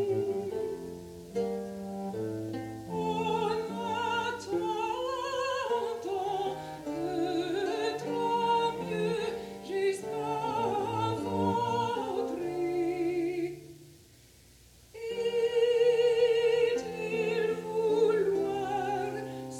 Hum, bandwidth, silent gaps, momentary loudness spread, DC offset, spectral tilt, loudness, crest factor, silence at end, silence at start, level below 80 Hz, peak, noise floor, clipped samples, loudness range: none; 16 kHz; none; 11 LU; under 0.1%; -5.5 dB/octave; -31 LUFS; 16 dB; 0 s; 0 s; -64 dBFS; -16 dBFS; -57 dBFS; under 0.1%; 6 LU